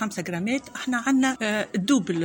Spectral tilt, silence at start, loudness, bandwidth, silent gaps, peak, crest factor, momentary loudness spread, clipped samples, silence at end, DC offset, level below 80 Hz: -4.5 dB/octave; 0 s; -25 LUFS; 17 kHz; none; -10 dBFS; 16 dB; 6 LU; under 0.1%; 0 s; under 0.1%; -64 dBFS